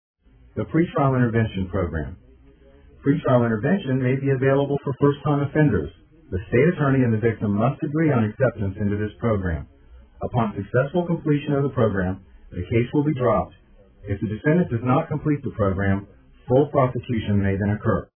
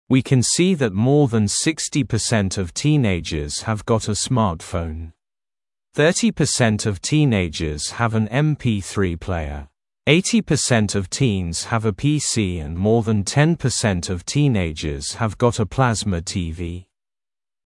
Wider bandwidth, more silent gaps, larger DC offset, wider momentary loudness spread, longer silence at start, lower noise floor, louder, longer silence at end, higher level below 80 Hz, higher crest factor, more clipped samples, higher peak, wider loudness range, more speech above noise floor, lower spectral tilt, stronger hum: second, 3.5 kHz vs 12 kHz; neither; neither; about the same, 9 LU vs 9 LU; first, 0.55 s vs 0.1 s; second, -51 dBFS vs under -90 dBFS; about the same, -22 LUFS vs -20 LUFS; second, 0.15 s vs 0.85 s; about the same, -44 dBFS vs -42 dBFS; about the same, 18 dB vs 20 dB; neither; second, -4 dBFS vs 0 dBFS; about the same, 3 LU vs 3 LU; second, 29 dB vs over 71 dB; first, -12.5 dB/octave vs -5 dB/octave; neither